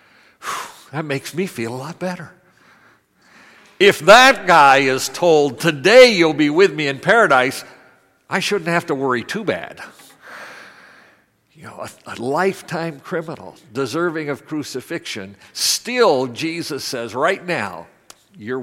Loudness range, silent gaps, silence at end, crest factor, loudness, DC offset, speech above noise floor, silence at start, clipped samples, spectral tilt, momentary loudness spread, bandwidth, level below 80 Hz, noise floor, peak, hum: 16 LU; none; 0 s; 18 dB; -16 LUFS; under 0.1%; 39 dB; 0.4 s; under 0.1%; -3.5 dB/octave; 22 LU; 16.5 kHz; -58 dBFS; -56 dBFS; 0 dBFS; none